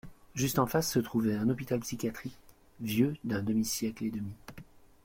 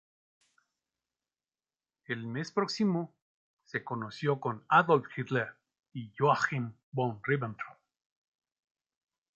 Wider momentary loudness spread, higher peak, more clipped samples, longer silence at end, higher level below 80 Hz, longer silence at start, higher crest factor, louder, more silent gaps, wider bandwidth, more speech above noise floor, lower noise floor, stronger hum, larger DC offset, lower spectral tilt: about the same, 14 LU vs 16 LU; second, -14 dBFS vs -10 dBFS; neither; second, 0.4 s vs 1.65 s; first, -58 dBFS vs -76 dBFS; second, 0.05 s vs 2.1 s; second, 18 dB vs 24 dB; about the same, -32 LUFS vs -31 LUFS; second, none vs 3.22-3.57 s, 5.79-5.83 s, 6.83-6.92 s; first, 16.5 kHz vs 8.2 kHz; second, 22 dB vs over 59 dB; second, -53 dBFS vs under -90 dBFS; neither; neither; second, -5 dB/octave vs -6.5 dB/octave